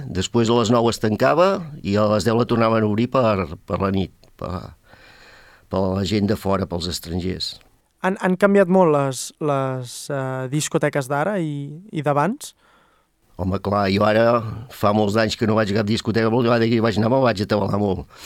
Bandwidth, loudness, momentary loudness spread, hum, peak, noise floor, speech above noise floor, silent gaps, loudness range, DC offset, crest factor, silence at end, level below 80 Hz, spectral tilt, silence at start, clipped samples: 16 kHz; -20 LUFS; 11 LU; none; -2 dBFS; -60 dBFS; 40 dB; none; 6 LU; under 0.1%; 18 dB; 0 s; -50 dBFS; -6 dB/octave; 0 s; under 0.1%